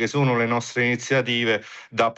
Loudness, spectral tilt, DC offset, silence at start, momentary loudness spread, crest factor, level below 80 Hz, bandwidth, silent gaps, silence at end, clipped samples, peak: -22 LUFS; -5 dB/octave; under 0.1%; 0 s; 4 LU; 14 dB; -66 dBFS; 8.4 kHz; none; 0.05 s; under 0.1%; -8 dBFS